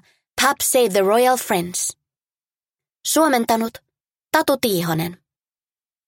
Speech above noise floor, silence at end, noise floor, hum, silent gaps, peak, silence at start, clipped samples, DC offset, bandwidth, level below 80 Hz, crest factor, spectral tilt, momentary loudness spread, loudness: over 72 dB; 0.95 s; under -90 dBFS; none; none; -2 dBFS; 0.35 s; under 0.1%; under 0.1%; 17 kHz; -60 dBFS; 20 dB; -3 dB/octave; 10 LU; -19 LUFS